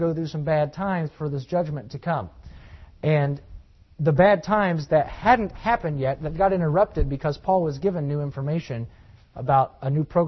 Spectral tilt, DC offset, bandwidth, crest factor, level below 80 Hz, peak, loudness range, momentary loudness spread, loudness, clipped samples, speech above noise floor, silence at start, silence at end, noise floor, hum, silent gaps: -8.5 dB/octave; under 0.1%; 6.2 kHz; 18 dB; -40 dBFS; -4 dBFS; 6 LU; 10 LU; -24 LUFS; under 0.1%; 22 dB; 0 s; 0 s; -45 dBFS; none; none